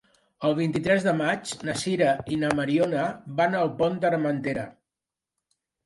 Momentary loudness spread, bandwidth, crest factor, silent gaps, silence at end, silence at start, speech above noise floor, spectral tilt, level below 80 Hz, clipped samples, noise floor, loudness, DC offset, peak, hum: 6 LU; 11.5 kHz; 20 dB; none; 1.15 s; 0.4 s; 64 dB; -5.5 dB/octave; -60 dBFS; under 0.1%; -89 dBFS; -25 LUFS; under 0.1%; -6 dBFS; none